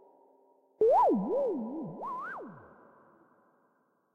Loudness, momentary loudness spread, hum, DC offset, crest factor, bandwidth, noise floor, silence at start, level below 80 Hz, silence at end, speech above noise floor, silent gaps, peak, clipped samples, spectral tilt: -30 LUFS; 17 LU; none; under 0.1%; 16 dB; 6.4 kHz; -72 dBFS; 0.8 s; -74 dBFS; 1.55 s; 38 dB; none; -18 dBFS; under 0.1%; -9 dB/octave